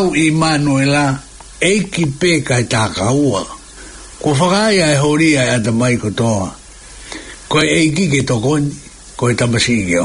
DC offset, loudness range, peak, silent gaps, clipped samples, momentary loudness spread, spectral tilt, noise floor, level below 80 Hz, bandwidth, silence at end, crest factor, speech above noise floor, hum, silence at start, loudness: under 0.1%; 2 LU; -2 dBFS; none; under 0.1%; 18 LU; -5 dB/octave; -35 dBFS; -40 dBFS; 11 kHz; 0 s; 14 dB; 22 dB; none; 0 s; -14 LUFS